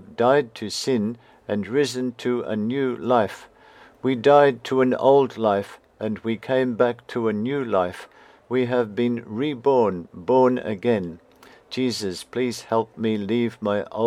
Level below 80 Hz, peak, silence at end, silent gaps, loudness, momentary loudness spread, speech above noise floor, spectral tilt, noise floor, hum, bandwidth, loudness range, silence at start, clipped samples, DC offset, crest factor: -66 dBFS; -2 dBFS; 0 s; none; -23 LUFS; 11 LU; 28 dB; -6 dB/octave; -50 dBFS; none; 14.5 kHz; 5 LU; 0 s; under 0.1%; under 0.1%; 20 dB